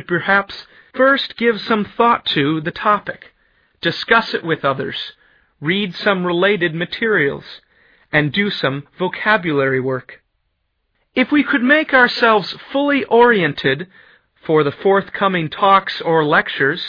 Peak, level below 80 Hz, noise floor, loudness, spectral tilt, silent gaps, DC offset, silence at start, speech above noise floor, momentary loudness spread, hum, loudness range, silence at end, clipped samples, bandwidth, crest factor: 0 dBFS; -56 dBFS; -69 dBFS; -16 LUFS; -7 dB/octave; none; under 0.1%; 0.1 s; 52 dB; 11 LU; none; 5 LU; 0 s; under 0.1%; 5.4 kHz; 16 dB